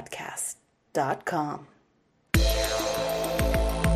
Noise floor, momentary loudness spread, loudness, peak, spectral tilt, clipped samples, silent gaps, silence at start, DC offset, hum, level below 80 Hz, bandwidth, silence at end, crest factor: -67 dBFS; 9 LU; -28 LUFS; -8 dBFS; -4.5 dB/octave; under 0.1%; none; 0 s; under 0.1%; none; -32 dBFS; 15.5 kHz; 0 s; 20 dB